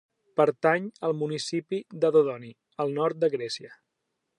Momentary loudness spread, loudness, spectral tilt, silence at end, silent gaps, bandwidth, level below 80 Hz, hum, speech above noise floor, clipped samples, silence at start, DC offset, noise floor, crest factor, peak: 12 LU; -27 LUFS; -5.5 dB/octave; 0.65 s; none; 11 kHz; -82 dBFS; none; 54 dB; under 0.1%; 0.35 s; under 0.1%; -81 dBFS; 20 dB; -8 dBFS